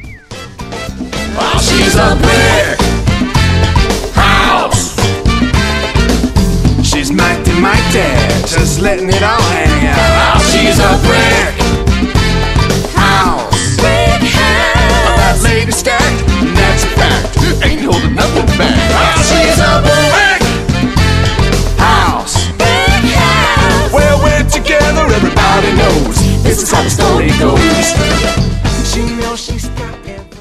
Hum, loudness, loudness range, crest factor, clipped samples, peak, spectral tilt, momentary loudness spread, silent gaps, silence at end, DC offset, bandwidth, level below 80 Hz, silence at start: none; -10 LUFS; 2 LU; 10 dB; 0.2%; 0 dBFS; -4.5 dB/octave; 5 LU; none; 0 s; under 0.1%; 15 kHz; -16 dBFS; 0 s